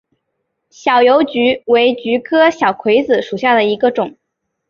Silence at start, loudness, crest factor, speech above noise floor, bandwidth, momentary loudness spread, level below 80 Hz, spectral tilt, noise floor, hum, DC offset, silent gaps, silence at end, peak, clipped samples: 0.85 s; -13 LUFS; 14 dB; 59 dB; 7 kHz; 6 LU; -60 dBFS; -5 dB/octave; -72 dBFS; none; under 0.1%; none; 0.6 s; -2 dBFS; under 0.1%